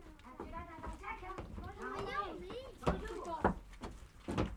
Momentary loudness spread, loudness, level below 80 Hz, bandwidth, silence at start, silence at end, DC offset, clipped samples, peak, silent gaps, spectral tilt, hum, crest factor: 14 LU; -43 LUFS; -50 dBFS; 17 kHz; 0 s; 0 s; under 0.1%; under 0.1%; -16 dBFS; none; -6.5 dB/octave; none; 26 dB